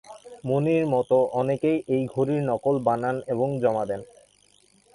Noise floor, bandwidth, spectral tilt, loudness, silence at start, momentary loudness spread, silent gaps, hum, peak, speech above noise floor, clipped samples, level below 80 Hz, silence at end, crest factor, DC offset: -60 dBFS; 11.5 kHz; -8.5 dB/octave; -24 LUFS; 0.1 s; 7 LU; none; none; -8 dBFS; 37 dB; under 0.1%; -62 dBFS; 0.9 s; 16 dB; under 0.1%